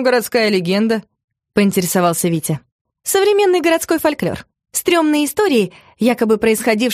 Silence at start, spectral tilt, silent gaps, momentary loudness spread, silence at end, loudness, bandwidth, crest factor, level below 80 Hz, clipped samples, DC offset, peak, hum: 0 s; -4.5 dB/octave; 1.24-1.28 s, 2.72-2.85 s; 9 LU; 0 s; -16 LUFS; 15.5 kHz; 14 dB; -54 dBFS; under 0.1%; under 0.1%; -2 dBFS; none